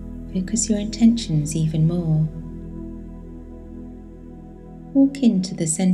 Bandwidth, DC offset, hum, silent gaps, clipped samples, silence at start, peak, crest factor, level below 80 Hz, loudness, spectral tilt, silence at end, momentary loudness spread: 12.5 kHz; under 0.1%; none; none; under 0.1%; 0 s; -6 dBFS; 16 dB; -40 dBFS; -20 LUFS; -6 dB/octave; 0 s; 23 LU